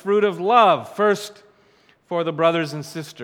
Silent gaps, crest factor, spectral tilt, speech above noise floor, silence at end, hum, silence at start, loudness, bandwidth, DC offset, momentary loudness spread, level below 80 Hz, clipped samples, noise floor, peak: none; 18 dB; -5 dB/octave; 37 dB; 0 s; none; 0.05 s; -19 LUFS; 16 kHz; under 0.1%; 15 LU; -76 dBFS; under 0.1%; -57 dBFS; -2 dBFS